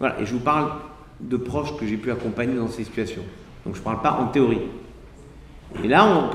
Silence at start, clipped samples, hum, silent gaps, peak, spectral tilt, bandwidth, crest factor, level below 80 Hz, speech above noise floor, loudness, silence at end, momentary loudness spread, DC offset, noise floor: 0 s; under 0.1%; none; none; -2 dBFS; -6.5 dB/octave; 12.5 kHz; 22 dB; -46 dBFS; 21 dB; -23 LUFS; 0 s; 18 LU; under 0.1%; -44 dBFS